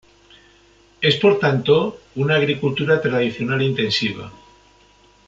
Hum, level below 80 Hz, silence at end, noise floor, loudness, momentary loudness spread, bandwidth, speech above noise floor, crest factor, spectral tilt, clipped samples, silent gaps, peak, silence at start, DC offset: none; -56 dBFS; 0.95 s; -53 dBFS; -19 LUFS; 9 LU; 7.8 kHz; 34 dB; 18 dB; -6 dB/octave; under 0.1%; none; -4 dBFS; 1 s; under 0.1%